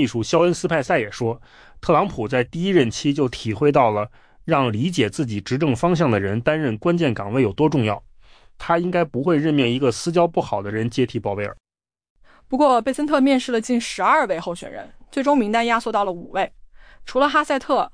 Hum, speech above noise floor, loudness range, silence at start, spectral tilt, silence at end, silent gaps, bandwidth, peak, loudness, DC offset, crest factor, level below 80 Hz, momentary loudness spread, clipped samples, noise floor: none; 28 dB; 2 LU; 0 s; -6 dB/octave; 0.05 s; 12.10-12.16 s; 10.5 kHz; -6 dBFS; -20 LUFS; under 0.1%; 16 dB; -50 dBFS; 9 LU; under 0.1%; -48 dBFS